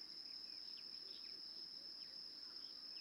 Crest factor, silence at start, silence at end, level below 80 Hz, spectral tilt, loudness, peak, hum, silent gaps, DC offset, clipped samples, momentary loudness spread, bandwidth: 12 dB; 0 s; 0 s; -88 dBFS; -1 dB/octave; -50 LUFS; -42 dBFS; none; none; under 0.1%; under 0.1%; 1 LU; over 20 kHz